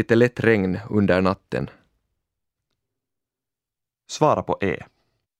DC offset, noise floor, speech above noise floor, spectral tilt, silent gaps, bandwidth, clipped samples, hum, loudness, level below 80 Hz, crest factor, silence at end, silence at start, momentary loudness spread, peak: under 0.1%; -88 dBFS; 67 dB; -6.5 dB/octave; none; 11.5 kHz; under 0.1%; none; -21 LUFS; -54 dBFS; 22 dB; 0.55 s; 0 s; 12 LU; -2 dBFS